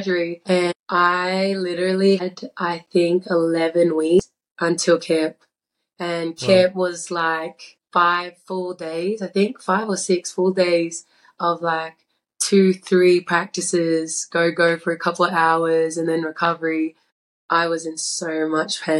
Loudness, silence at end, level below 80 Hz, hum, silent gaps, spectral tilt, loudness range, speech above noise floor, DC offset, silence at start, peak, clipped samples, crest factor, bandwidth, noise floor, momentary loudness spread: -20 LUFS; 0 s; -64 dBFS; none; 0.75-0.84 s, 4.51-4.55 s, 17.12-17.49 s; -4.5 dB/octave; 3 LU; 60 dB; under 0.1%; 0 s; -4 dBFS; under 0.1%; 18 dB; 12 kHz; -80 dBFS; 9 LU